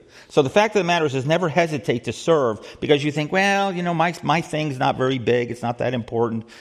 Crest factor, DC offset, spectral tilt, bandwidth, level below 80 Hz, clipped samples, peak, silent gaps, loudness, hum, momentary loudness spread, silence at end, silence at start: 18 dB; under 0.1%; -5.5 dB/octave; 13 kHz; -58 dBFS; under 0.1%; -2 dBFS; none; -21 LUFS; none; 7 LU; 0 s; 0.15 s